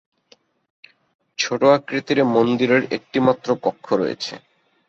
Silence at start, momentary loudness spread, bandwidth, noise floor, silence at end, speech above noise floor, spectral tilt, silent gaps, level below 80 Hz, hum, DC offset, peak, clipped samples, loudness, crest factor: 1.4 s; 11 LU; 7.8 kHz; -57 dBFS; 0.5 s; 38 dB; -5 dB/octave; none; -64 dBFS; none; under 0.1%; -2 dBFS; under 0.1%; -20 LUFS; 18 dB